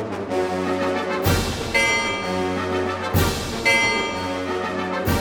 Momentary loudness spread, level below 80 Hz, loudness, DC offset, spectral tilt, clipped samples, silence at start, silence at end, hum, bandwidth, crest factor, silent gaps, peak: 7 LU; -38 dBFS; -21 LUFS; under 0.1%; -4 dB/octave; under 0.1%; 0 s; 0 s; none; 19 kHz; 16 dB; none; -6 dBFS